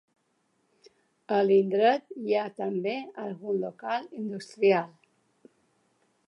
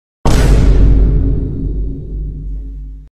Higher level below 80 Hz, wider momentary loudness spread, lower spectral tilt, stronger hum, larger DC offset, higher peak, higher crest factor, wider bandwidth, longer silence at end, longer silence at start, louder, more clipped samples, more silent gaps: second, -84 dBFS vs -12 dBFS; about the same, 14 LU vs 16 LU; about the same, -6.5 dB/octave vs -7 dB/octave; neither; neither; second, -10 dBFS vs 0 dBFS; first, 18 dB vs 12 dB; second, 9.4 kHz vs 11 kHz; first, 1.4 s vs 0.1 s; first, 1.3 s vs 0.25 s; second, -28 LUFS vs -15 LUFS; neither; neither